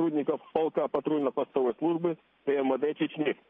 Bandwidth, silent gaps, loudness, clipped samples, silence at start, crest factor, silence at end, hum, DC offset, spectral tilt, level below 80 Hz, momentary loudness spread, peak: 3.8 kHz; none; -29 LUFS; under 0.1%; 0 s; 18 dB; 0.15 s; none; under 0.1%; -9.5 dB/octave; -74 dBFS; 3 LU; -12 dBFS